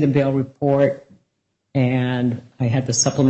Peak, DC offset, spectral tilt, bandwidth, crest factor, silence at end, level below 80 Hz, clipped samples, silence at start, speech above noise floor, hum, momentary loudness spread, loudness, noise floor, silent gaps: -4 dBFS; under 0.1%; -5.5 dB/octave; 8.4 kHz; 14 dB; 0 s; -58 dBFS; under 0.1%; 0 s; 54 dB; none; 7 LU; -20 LUFS; -73 dBFS; none